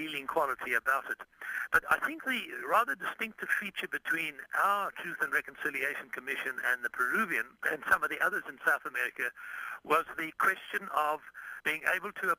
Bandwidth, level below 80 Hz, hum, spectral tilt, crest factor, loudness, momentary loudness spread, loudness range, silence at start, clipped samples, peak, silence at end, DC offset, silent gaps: 15.5 kHz; -70 dBFS; none; -2.5 dB/octave; 20 dB; -32 LUFS; 8 LU; 1 LU; 0 s; under 0.1%; -12 dBFS; 0.05 s; under 0.1%; none